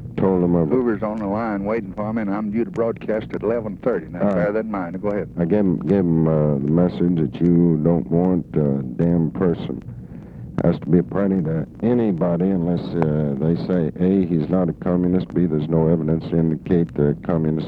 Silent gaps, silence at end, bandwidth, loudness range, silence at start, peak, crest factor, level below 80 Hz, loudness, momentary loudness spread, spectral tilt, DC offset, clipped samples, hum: none; 0 s; 4.7 kHz; 4 LU; 0 s; -2 dBFS; 16 dB; -44 dBFS; -20 LUFS; 7 LU; -11 dB/octave; under 0.1%; under 0.1%; none